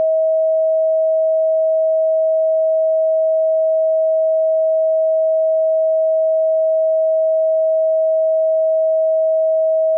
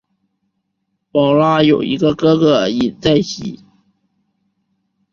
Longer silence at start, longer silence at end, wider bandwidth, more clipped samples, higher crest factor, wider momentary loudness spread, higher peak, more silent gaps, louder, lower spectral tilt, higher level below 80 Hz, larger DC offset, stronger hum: second, 0 s vs 1.15 s; second, 0 s vs 1.55 s; second, 0.7 kHz vs 7.4 kHz; neither; second, 4 dB vs 16 dB; second, 0 LU vs 10 LU; second, -12 dBFS vs -2 dBFS; neither; about the same, -16 LUFS vs -14 LUFS; second, 20.5 dB/octave vs -6.5 dB/octave; second, under -90 dBFS vs -50 dBFS; neither; neither